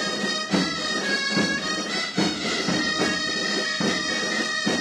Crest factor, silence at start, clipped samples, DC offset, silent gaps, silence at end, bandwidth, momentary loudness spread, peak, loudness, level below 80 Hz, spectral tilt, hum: 16 dB; 0 s; under 0.1%; under 0.1%; none; 0 s; 14.5 kHz; 3 LU; -8 dBFS; -23 LUFS; -58 dBFS; -3 dB/octave; none